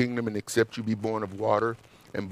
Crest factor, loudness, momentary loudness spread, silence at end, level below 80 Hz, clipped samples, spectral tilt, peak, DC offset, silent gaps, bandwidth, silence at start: 18 dB; -29 LUFS; 11 LU; 0 s; -66 dBFS; under 0.1%; -5.5 dB/octave; -10 dBFS; under 0.1%; none; 15.5 kHz; 0 s